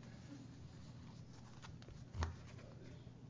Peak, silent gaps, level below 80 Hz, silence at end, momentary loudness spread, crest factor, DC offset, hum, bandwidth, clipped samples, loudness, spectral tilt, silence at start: -26 dBFS; none; -56 dBFS; 0 s; 10 LU; 26 dB; under 0.1%; none; 7.6 kHz; under 0.1%; -53 LUFS; -6 dB/octave; 0 s